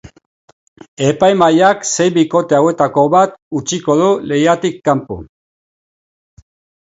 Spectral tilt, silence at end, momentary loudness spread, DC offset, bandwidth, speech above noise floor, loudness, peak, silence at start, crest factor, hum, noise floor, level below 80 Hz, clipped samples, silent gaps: -5 dB/octave; 1.6 s; 8 LU; under 0.1%; 8 kHz; over 77 dB; -13 LUFS; 0 dBFS; 0.05 s; 14 dB; none; under -90 dBFS; -50 dBFS; under 0.1%; 0.26-0.76 s, 0.88-0.97 s, 3.42-3.51 s